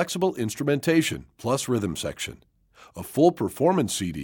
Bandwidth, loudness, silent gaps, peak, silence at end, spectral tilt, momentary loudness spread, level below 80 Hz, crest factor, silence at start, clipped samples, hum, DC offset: 18 kHz; -25 LUFS; none; -6 dBFS; 0 s; -5 dB/octave; 12 LU; -54 dBFS; 20 dB; 0 s; under 0.1%; none; under 0.1%